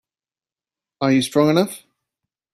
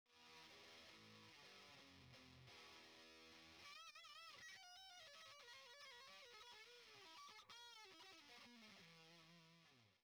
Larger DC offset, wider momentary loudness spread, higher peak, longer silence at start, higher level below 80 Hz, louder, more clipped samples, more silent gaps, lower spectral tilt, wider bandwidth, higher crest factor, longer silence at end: neither; first, 9 LU vs 5 LU; first, -2 dBFS vs -50 dBFS; first, 1 s vs 0.05 s; first, -64 dBFS vs under -90 dBFS; first, -18 LUFS vs -62 LUFS; neither; neither; first, -5.5 dB/octave vs -2 dB/octave; second, 14.5 kHz vs over 20 kHz; first, 20 dB vs 14 dB; first, 0.75 s vs 0 s